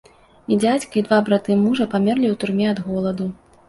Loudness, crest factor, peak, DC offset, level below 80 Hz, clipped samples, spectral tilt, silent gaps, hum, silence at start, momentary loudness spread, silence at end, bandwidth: -20 LUFS; 16 dB; -4 dBFS; under 0.1%; -56 dBFS; under 0.1%; -6.5 dB/octave; none; none; 0.5 s; 7 LU; 0.35 s; 11.5 kHz